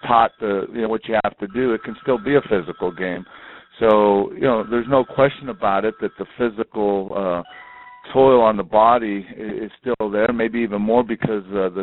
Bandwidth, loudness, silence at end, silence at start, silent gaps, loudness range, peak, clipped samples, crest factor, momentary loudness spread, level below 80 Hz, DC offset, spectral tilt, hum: 4.1 kHz; -19 LUFS; 0 s; 0.05 s; none; 3 LU; -2 dBFS; under 0.1%; 18 dB; 12 LU; -50 dBFS; under 0.1%; -5 dB/octave; none